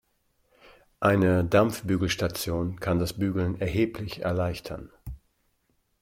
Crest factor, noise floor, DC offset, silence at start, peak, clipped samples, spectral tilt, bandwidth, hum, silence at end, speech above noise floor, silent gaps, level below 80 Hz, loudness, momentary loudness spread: 20 dB; -72 dBFS; under 0.1%; 1 s; -6 dBFS; under 0.1%; -6 dB/octave; 16.5 kHz; none; 0.85 s; 46 dB; none; -48 dBFS; -26 LUFS; 17 LU